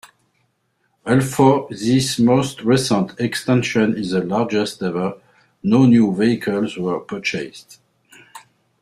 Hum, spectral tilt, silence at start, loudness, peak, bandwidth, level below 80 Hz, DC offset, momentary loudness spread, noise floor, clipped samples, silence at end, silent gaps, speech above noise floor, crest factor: none; -6 dB/octave; 1.05 s; -18 LUFS; -2 dBFS; 14 kHz; -54 dBFS; under 0.1%; 10 LU; -67 dBFS; under 0.1%; 0.4 s; none; 50 dB; 16 dB